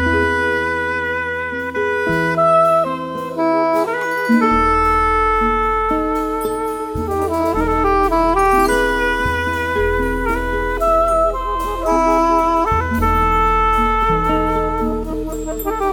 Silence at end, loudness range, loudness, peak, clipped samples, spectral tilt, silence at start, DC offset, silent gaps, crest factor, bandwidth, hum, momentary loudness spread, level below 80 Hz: 0 s; 2 LU; -17 LUFS; -2 dBFS; under 0.1%; -6 dB/octave; 0 s; under 0.1%; none; 14 dB; 18 kHz; none; 7 LU; -28 dBFS